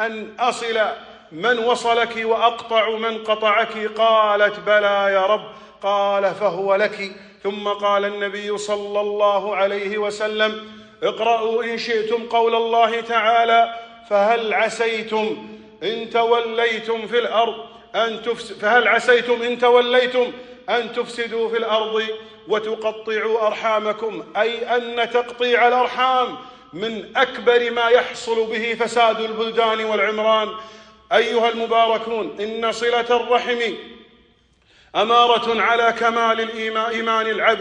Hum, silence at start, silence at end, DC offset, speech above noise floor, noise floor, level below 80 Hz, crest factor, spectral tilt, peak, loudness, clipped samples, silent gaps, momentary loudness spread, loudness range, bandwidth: none; 0 s; 0 s; under 0.1%; 38 dB; -57 dBFS; -64 dBFS; 16 dB; -3 dB/octave; -2 dBFS; -19 LUFS; under 0.1%; none; 10 LU; 4 LU; 10 kHz